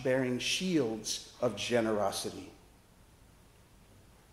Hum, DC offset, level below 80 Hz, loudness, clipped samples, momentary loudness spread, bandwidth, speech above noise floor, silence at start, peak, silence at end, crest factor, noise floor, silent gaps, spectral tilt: none; under 0.1%; -64 dBFS; -32 LUFS; under 0.1%; 10 LU; 16 kHz; 28 dB; 0 s; -16 dBFS; 1.75 s; 18 dB; -60 dBFS; none; -4 dB/octave